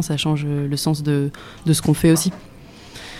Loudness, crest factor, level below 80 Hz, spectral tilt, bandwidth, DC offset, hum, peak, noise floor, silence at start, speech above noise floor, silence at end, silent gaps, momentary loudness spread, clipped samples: -20 LUFS; 16 dB; -44 dBFS; -5.5 dB/octave; 16 kHz; under 0.1%; none; -4 dBFS; -40 dBFS; 0 s; 21 dB; 0 s; none; 16 LU; under 0.1%